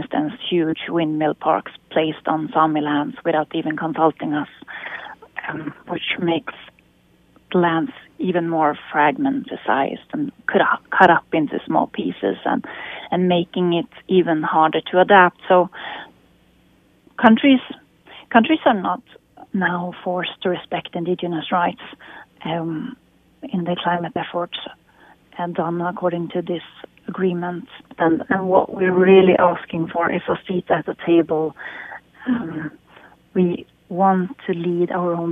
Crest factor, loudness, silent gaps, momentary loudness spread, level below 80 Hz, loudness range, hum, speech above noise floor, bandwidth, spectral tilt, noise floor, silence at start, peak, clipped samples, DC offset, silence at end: 20 dB; -20 LUFS; none; 16 LU; -62 dBFS; 8 LU; none; 37 dB; 3.9 kHz; -8.5 dB/octave; -56 dBFS; 0 s; 0 dBFS; under 0.1%; under 0.1%; 0 s